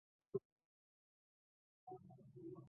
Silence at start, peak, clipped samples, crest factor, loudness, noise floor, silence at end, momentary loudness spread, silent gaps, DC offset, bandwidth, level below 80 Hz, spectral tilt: 0.35 s; -30 dBFS; under 0.1%; 26 dB; -54 LUFS; under -90 dBFS; 0 s; 12 LU; 0.45-0.57 s, 0.65-1.87 s; under 0.1%; 1.5 kHz; under -90 dBFS; -11 dB/octave